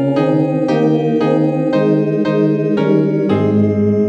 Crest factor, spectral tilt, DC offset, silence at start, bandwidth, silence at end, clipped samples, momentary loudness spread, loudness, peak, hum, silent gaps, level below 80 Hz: 12 dB; -9.5 dB/octave; under 0.1%; 0 s; 7.2 kHz; 0 s; under 0.1%; 1 LU; -14 LUFS; -2 dBFS; none; none; -60 dBFS